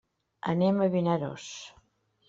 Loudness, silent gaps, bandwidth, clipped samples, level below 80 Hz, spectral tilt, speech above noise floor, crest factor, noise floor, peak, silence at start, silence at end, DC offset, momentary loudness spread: -28 LUFS; none; 7.8 kHz; under 0.1%; -68 dBFS; -7 dB/octave; 39 dB; 16 dB; -67 dBFS; -14 dBFS; 0.45 s; 0.6 s; under 0.1%; 17 LU